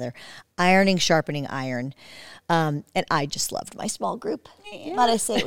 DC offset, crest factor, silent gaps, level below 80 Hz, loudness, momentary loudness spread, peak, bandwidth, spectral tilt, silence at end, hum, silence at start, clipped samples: under 0.1%; 18 dB; none; -56 dBFS; -24 LUFS; 20 LU; -6 dBFS; 17.5 kHz; -4 dB/octave; 0 s; none; 0 s; under 0.1%